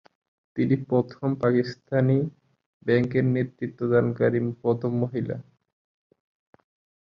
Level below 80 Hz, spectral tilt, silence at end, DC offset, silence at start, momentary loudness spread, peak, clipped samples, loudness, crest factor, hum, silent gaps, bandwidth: -60 dBFS; -9.5 dB/octave; 1.6 s; under 0.1%; 0.55 s; 9 LU; -8 dBFS; under 0.1%; -25 LUFS; 18 dB; none; 2.66-2.80 s; 6.2 kHz